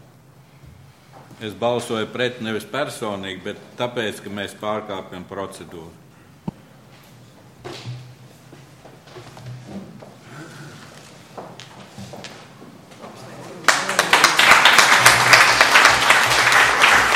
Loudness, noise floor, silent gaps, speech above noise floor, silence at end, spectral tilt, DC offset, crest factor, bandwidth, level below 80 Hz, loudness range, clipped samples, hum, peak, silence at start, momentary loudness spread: -15 LUFS; -48 dBFS; none; 22 dB; 0 s; -1.5 dB/octave; under 0.1%; 20 dB; 16.5 kHz; -52 dBFS; 27 LU; under 0.1%; none; 0 dBFS; 1.3 s; 27 LU